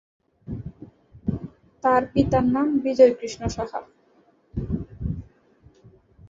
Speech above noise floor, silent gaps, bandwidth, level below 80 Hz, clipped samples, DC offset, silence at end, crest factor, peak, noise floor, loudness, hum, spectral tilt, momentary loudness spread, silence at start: 40 dB; none; 7.6 kHz; -42 dBFS; under 0.1%; under 0.1%; 0.05 s; 22 dB; -4 dBFS; -60 dBFS; -23 LUFS; none; -7 dB/octave; 19 LU; 0.45 s